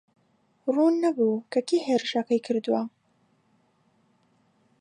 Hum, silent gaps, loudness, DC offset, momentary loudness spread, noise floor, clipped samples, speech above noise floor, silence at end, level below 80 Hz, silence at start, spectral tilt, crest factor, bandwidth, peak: none; none; -25 LUFS; under 0.1%; 6 LU; -67 dBFS; under 0.1%; 43 dB; 1.9 s; -84 dBFS; 0.65 s; -5 dB/octave; 16 dB; 10.5 kHz; -12 dBFS